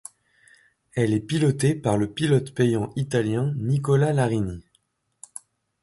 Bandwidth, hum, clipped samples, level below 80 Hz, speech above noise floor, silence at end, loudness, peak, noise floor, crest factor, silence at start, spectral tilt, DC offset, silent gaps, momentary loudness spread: 11.5 kHz; none; under 0.1%; -52 dBFS; 46 dB; 1.2 s; -23 LUFS; -8 dBFS; -69 dBFS; 16 dB; 0.95 s; -6.5 dB/octave; under 0.1%; none; 20 LU